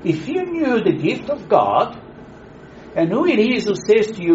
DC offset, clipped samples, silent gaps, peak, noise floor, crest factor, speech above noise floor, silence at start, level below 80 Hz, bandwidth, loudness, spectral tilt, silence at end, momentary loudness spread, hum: under 0.1%; under 0.1%; none; 0 dBFS; -40 dBFS; 18 dB; 23 dB; 0 s; -52 dBFS; 8 kHz; -18 LUFS; -5 dB/octave; 0 s; 8 LU; none